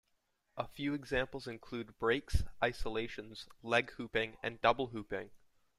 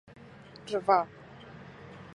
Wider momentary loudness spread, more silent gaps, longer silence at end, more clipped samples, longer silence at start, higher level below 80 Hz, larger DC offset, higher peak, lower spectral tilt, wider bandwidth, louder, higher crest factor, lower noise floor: second, 13 LU vs 24 LU; neither; first, 0.4 s vs 0.1 s; neither; about the same, 0.55 s vs 0.65 s; first, -48 dBFS vs -66 dBFS; neither; second, -14 dBFS vs -10 dBFS; about the same, -5.5 dB/octave vs -5.5 dB/octave; first, 14 kHz vs 11 kHz; second, -37 LUFS vs -29 LUFS; about the same, 22 dB vs 24 dB; first, -79 dBFS vs -50 dBFS